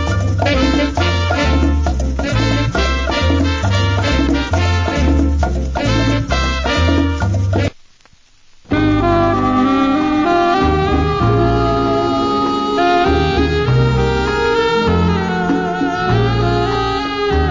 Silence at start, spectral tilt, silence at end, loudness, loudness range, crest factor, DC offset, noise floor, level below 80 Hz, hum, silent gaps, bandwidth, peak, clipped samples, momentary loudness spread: 0 s; -6.5 dB/octave; 0 s; -15 LUFS; 2 LU; 12 dB; under 0.1%; -47 dBFS; -22 dBFS; none; none; 7.6 kHz; -2 dBFS; under 0.1%; 4 LU